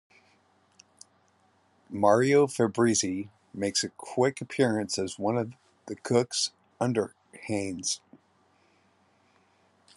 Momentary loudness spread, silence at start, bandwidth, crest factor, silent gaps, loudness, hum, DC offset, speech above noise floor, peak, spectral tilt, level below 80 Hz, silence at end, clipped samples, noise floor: 14 LU; 1.9 s; 12 kHz; 22 dB; none; -28 LUFS; none; under 0.1%; 39 dB; -8 dBFS; -4 dB/octave; -74 dBFS; 2 s; under 0.1%; -66 dBFS